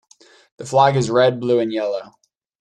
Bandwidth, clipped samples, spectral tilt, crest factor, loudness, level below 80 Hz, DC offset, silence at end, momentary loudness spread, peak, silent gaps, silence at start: 10.5 kHz; under 0.1%; -6 dB/octave; 18 dB; -18 LUFS; -60 dBFS; under 0.1%; 0.55 s; 11 LU; -2 dBFS; none; 0.6 s